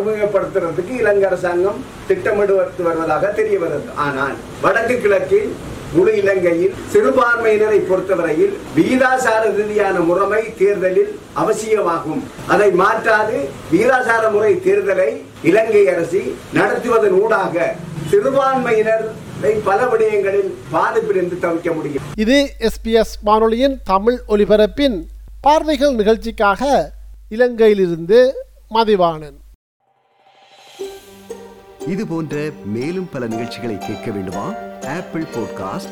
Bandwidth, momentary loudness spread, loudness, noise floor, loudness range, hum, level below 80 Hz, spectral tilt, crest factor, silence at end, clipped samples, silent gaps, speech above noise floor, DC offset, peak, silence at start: 15.5 kHz; 11 LU; -16 LUFS; -55 dBFS; 9 LU; none; -40 dBFS; -5.5 dB/octave; 14 dB; 0 s; under 0.1%; 29.55-29.80 s; 40 dB; under 0.1%; -2 dBFS; 0 s